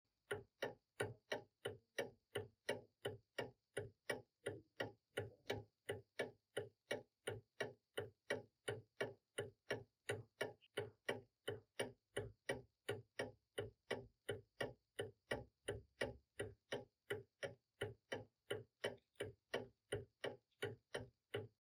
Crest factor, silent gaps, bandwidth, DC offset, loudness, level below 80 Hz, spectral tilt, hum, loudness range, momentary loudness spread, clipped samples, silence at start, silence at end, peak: 24 dB; none; 18 kHz; under 0.1%; -51 LUFS; -76 dBFS; -4 dB/octave; none; 1 LU; 4 LU; under 0.1%; 0.3 s; 0.15 s; -28 dBFS